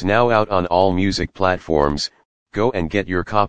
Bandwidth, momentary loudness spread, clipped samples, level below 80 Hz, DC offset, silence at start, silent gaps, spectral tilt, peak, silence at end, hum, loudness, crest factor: 9.6 kHz; 6 LU; under 0.1%; -38 dBFS; 2%; 0 s; 2.25-2.46 s; -6 dB/octave; 0 dBFS; 0 s; none; -19 LUFS; 18 dB